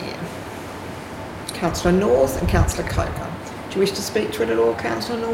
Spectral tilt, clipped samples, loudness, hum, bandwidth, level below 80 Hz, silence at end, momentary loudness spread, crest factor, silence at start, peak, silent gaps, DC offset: -5.5 dB/octave; under 0.1%; -22 LUFS; none; 16.5 kHz; -34 dBFS; 0 s; 14 LU; 16 dB; 0 s; -6 dBFS; none; under 0.1%